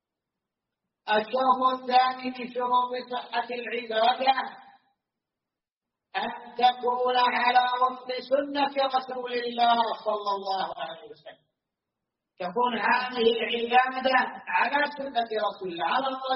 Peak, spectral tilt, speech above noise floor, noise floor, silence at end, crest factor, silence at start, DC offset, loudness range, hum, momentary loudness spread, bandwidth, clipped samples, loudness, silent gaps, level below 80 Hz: -8 dBFS; 0.5 dB/octave; 63 dB; -89 dBFS; 0 s; 20 dB; 1.05 s; under 0.1%; 5 LU; none; 10 LU; 5.8 kHz; under 0.1%; -26 LUFS; 5.72-5.81 s; -76 dBFS